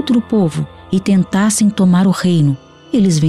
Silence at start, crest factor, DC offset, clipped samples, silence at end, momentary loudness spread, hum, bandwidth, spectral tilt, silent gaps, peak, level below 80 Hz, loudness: 0 s; 8 dB; under 0.1%; under 0.1%; 0 s; 8 LU; none; 13.5 kHz; -6 dB/octave; none; -6 dBFS; -48 dBFS; -14 LUFS